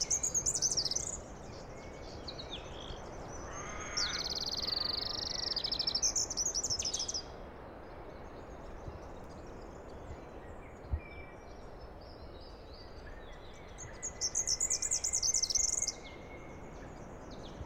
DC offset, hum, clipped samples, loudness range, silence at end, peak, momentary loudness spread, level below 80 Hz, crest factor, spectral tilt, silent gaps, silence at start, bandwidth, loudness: under 0.1%; none; under 0.1%; 16 LU; 0 s; -20 dBFS; 21 LU; -52 dBFS; 18 dB; -1 dB/octave; none; 0 s; 16 kHz; -33 LUFS